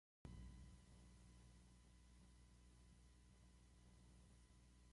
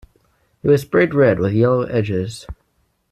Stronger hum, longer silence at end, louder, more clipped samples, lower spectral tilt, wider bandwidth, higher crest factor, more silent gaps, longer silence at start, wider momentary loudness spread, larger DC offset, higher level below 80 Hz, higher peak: first, 60 Hz at -70 dBFS vs none; second, 0 s vs 0.6 s; second, -66 LUFS vs -17 LUFS; neither; second, -5 dB/octave vs -7.5 dB/octave; second, 11.5 kHz vs 14 kHz; first, 22 dB vs 16 dB; neither; second, 0.25 s vs 0.65 s; second, 8 LU vs 14 LU; neither; second, -68 dBFS vs -46 dBFS; second, -44 dBFS vs -2 dBFS